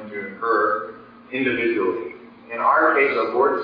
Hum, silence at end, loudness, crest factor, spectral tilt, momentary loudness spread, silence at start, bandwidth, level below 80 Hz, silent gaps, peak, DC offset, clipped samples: none; 0 s; -20 LUFS; 18 dB; -7.5 dB/octave; 15 LU; 0 s; 5.2 kHz; -64 dBFS; none; -4 dBFS; under 0.1%; under 0.1%